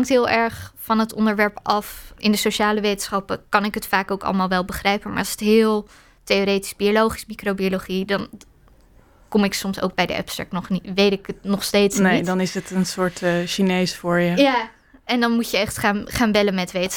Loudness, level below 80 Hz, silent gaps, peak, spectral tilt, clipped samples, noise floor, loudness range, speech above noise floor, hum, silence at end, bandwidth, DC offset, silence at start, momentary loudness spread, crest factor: -21 LUFS; -48 dBFS; none; -2 dBFS; -4.5 dB/octave; under 0.1%; -52 dBFS; 3 LU; 31 dB; none; 0 s; 19 kHz; under 0.1%; 0 s; 8 LU; 18 dB